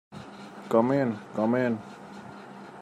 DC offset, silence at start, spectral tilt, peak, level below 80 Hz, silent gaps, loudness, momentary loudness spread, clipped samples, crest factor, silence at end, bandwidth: under 0.1%; 0.1 s; -8 dB/octave; -8 dBFS; -72 dBFS; none; -27 LUFS; 20 LU; under 0.1%; 20 dB; 0 s; 12.5 kHz